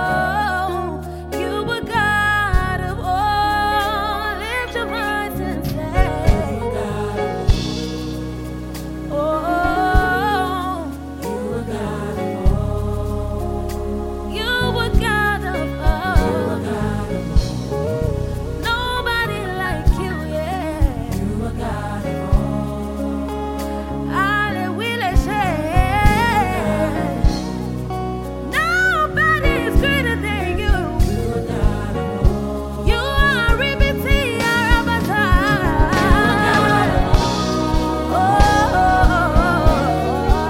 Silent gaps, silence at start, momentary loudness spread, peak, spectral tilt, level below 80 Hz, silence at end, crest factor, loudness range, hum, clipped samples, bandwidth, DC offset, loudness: none; 0 s; 9 LU; 0 dBFS; -6 dB/octave; -24 dBFS; 0 s; 18 dB; 6 LU; none; under 0.1%; 16.5 kHz; under 0.1%; -19 LUFS